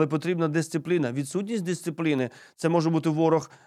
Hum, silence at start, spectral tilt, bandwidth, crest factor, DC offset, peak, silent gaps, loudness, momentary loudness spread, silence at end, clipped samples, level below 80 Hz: none; 0 s; -6.5 dB/octave; 13.5 kHz; 16 dB; under 0.1%; -10 dBFS; none; -26 LUFS; 6 LU; 0.2 s; under 0.1%; -76 dBFS